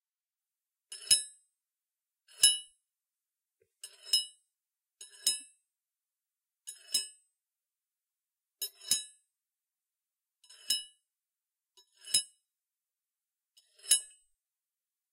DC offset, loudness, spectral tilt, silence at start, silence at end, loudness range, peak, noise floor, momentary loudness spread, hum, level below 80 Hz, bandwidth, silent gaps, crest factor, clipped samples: under 0.1%; -30 LUFS; 3.5 dB/octave; 0.9 s; 1.1 s; 9 LU; -10 dBFS; under -90 dBFS; 25 LU; none; -80 dBFS; 16 kHz; none; 30 dB; under 0.1%